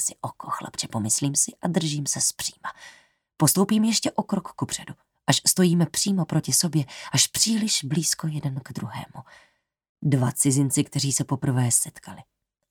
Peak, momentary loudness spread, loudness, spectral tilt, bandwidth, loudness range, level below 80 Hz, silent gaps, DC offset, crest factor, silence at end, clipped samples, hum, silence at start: -4 dBFS; 13 LU; -23 LUFS; -3.5 dB/octave; 20 kHz; 4 LU; -64 dBFS; 9.89-9.95 s; under 0.1%; 22 dB; 0.5 s; under 0.1%; none; 0 s